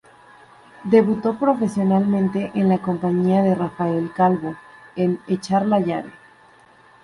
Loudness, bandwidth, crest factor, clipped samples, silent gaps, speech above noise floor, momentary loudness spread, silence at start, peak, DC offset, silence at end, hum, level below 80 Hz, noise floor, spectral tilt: -20 LUFS; 11.5 kHz; 18 dB; under 0.1%; none; 32 dB; 10 LU; 0.8 s; -4 dBFS; under 0.1%; 0.9 s; none; -58 dBFS; -51 dBFS; -8.5 dB/octave